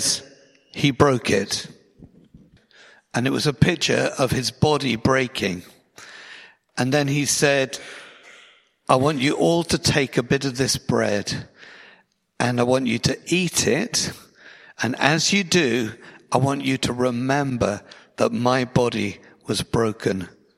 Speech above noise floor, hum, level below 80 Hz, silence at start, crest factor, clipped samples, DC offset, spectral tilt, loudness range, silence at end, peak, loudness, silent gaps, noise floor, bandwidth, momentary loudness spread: 36 dB; none; -50 dBFS; 0 s; 22 dB; under 0.1%; under 0.1%; -4 dB/octave; 3 LU; 0.3 s; 0 dBFS; -21 LUFS; none; -57 dBFS; 15.5 kHz; 14 LU